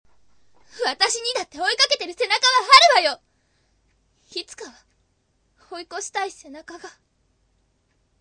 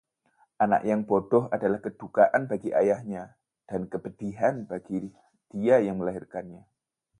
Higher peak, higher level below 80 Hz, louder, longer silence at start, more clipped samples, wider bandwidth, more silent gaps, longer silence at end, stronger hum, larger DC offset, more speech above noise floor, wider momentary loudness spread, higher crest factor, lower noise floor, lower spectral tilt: first, 0 dBFS vs -8 dBFS; about the same, -64 dBFS vs -64 dBFS; first, -18 LUFS vs -27 LUFS; first, 0.75 s vs 0.6 s; neither; about the same, 11 kHz vs 10.5 kHz; neither; first, 1.3 s vs 0.6 s; neither; neither; about the same, 43 dB vs 41 dB; first, 28 LU vs 16 LU; about the same, 24 dB vs 20 dB; about the same, -67 dBFS vs -67 dBFS; second, 1.5 dB/octave vs -8.5 dB/octave